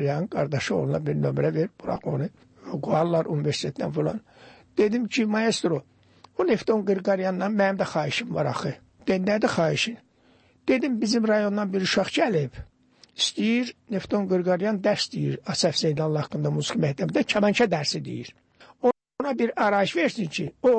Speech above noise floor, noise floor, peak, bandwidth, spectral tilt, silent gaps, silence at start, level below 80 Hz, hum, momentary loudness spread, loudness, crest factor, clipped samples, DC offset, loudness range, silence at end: 35 dB; -60 dBFS; -10 dBFS; 8.8 kHz; -5.5 dB/octave; none; 0 s; -60 dBFS; none; 9 LU; -25 LUFS; 16 dB; under 0.1%; under 0.1%; 2 LU; 0 s